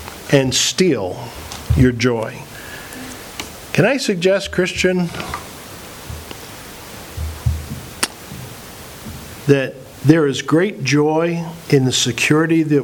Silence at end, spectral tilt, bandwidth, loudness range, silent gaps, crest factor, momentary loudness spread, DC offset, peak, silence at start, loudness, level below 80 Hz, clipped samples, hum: 0 s; -5 dB/octave; over 20 kHz; 11 LU; none; 18 dB; 18 LU; under 0.1%; 0 dBFS; 0 s; -17 LUFS; -36 dBFS; under 0.1%; none